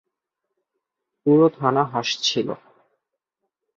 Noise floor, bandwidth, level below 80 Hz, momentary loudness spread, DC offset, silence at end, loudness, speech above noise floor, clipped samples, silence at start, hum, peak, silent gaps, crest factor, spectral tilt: -81 dBFS; 7.6 kHz; -68 dBFS; 11 LU; under 0.1%; 1.25 s; -20 LUFS; 61 dB; under 0.1%; 1.25 s; none; -2 dBFS; none; 22 dB; -5 dB/octave